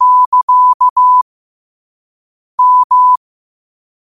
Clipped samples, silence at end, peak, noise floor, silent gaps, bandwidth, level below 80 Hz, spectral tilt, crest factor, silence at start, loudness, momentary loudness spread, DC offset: under 0.1%; 0.95 s; -4 dBFS; under -90 dBFS; 0.26-0.32 s, 0.43-0.48 s, 0.74-0.80 s, 0.90-0.96 s, 1.22-2.58 s, 2.84-2.90 s; 1.3 kHz; -68 dBFS; -1 dB/octave; 8 dB; 0 s; -9 LUFS; 7 LU; 0.4%